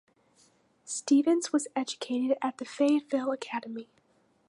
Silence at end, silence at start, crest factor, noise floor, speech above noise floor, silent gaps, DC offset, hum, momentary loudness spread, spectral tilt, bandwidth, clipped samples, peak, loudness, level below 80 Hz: 0.65 s; 0.85 s; 16 dB; -68 dBFS; 39 dB; none; under 0.1%; none; 12 LU; -3 dB/octave; 11 kHz; under 0.1%; -14 dBFS; -29 LUFS; -86 dBFS